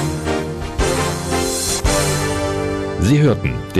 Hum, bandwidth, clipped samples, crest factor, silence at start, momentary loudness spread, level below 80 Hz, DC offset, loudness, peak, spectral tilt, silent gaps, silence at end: none; 15 kHz; under 0.1%; 12 dB; 0 s; 7 LU; -28 dBFS; under 0.1%; -18 LUFS; -4 dBFS; -4.5 dB/octave; none; 0 s